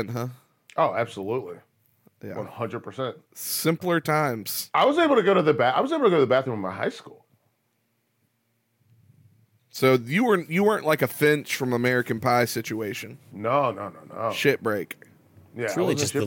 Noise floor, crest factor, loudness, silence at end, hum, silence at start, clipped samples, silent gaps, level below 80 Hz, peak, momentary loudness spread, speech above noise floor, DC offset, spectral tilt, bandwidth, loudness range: -72 dBFS; 18 dB; -24 LUFS; 0 s; none; 0 s; under 0.1%; none; -78 dBFS; -6 dBFS; 16 LU; 48 dB; under 0.1%; -5 dB/octave; 17 kHz; 8 LU